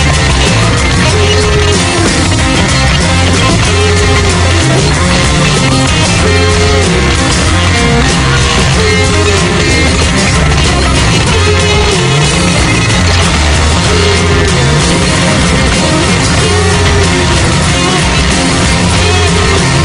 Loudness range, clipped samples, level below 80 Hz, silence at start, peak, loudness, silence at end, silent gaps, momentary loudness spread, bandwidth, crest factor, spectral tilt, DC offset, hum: 0 LU; 0.4%; -18 dBFS; 0 s; 0 dBFS; -8 LUFS; 0 s; none; 1 LU; 11 kHz; 8 dB; -4 dB/octave; under 0.1%; none